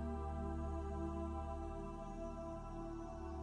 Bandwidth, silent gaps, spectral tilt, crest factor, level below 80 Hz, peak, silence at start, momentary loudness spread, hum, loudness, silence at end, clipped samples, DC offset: 9.8 kHz; none; -8.5 dB/octave; 12 dB; -48 dBFS; -32 dBFS; 0 s; 5 LU; none; -46 LUFS; 0 s; under 0.1%; under 0.1%